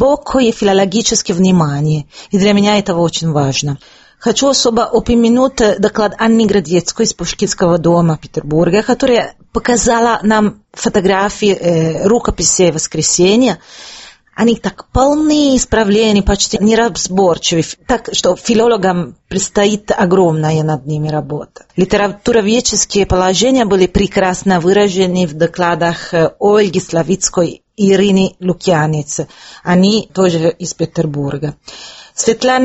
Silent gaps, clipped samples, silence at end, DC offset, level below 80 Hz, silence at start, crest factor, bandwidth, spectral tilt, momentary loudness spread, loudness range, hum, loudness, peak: none; under 0.1%; 0 s; under 0.1%; -34 dBFS; 0 s; 12 dB; 8.4 kHz; -4.5 dB/octave; 8 LU; 2 LU; none; -13 LUFS; 0 dBFS